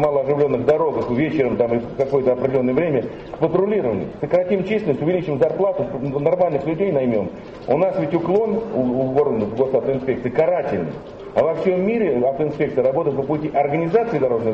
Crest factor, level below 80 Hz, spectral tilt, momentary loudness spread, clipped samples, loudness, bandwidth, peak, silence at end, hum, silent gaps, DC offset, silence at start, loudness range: 14 dB; -50 dBFS; -9.5 dB/octave; 5 LU; under 0.1%; -20 LUFS; 7 kHz; -4 dBFS; 0 s; none; none; under 0.1%; 0 s; 1 LU